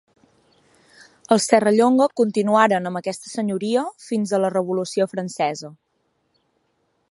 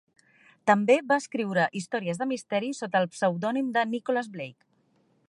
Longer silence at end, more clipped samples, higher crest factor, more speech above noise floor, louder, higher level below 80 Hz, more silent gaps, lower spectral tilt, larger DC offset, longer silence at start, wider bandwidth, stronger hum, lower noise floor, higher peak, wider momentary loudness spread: first, 1.4 s vs 0.75 s; neither; about the same, 20 dB vs 20 dB; first, 50 dB vs 41 dB; first, -20 LUFS vs -27 LUFS; first, -72 dBFS vs -78 dBFS; neither; about the same, -5 dB/octave vs -5.5 dB/octave; neither; first, 1.3 s vs 0.65 s; about the same, 11.5 kHz vs 11.5 kHz; neither; about the same, -69 dBFS vs -67 dBFS; first, -2 dBFS vs -8 dBFS; about the same, 11 LU vs 9 LU